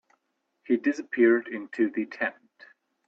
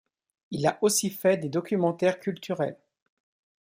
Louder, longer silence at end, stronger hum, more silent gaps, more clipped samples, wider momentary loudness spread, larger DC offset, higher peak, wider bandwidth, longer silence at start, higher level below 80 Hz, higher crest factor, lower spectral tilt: about the same, -26 LUFS vs -27 LUFS; second, 0.75 s vs 0.9 s; neither; neither; neither; about the same, 10 LU vs 8 LU; neither; about the same, -10 dBFS vs -10 dBFS; second, 7 kHz vs 16 kHz; first, 0.7 s vs 0.5 s; about the same, -74 dBFS vs -72 dBFS; about the same, 18 dB vs 18 dB; first, -6 dB/octave vs -4.5 dB/octave